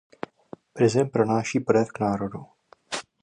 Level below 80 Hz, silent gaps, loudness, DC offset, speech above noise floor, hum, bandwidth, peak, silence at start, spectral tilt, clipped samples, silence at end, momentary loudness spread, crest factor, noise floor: -60 dBFS; none; -24 LUFS; under 0.1%; 25 dB; none; 11 kHz; -6 dBFS; 0.75 s; -6 dB/octave; under 0.1%; 0.2 s; 18 LU; 20 dB; -48 dBFS